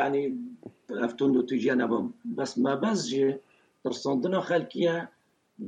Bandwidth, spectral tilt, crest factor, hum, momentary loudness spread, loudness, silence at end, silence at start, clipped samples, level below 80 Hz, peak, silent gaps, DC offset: 9.4 kHz; -5.5 dB/octave; 14 dB; none; 12 LU; -28 LUFS; 0 s; 0 s; under 0.1%; -78 dBFS; -14 dBFS; none; under 0.1%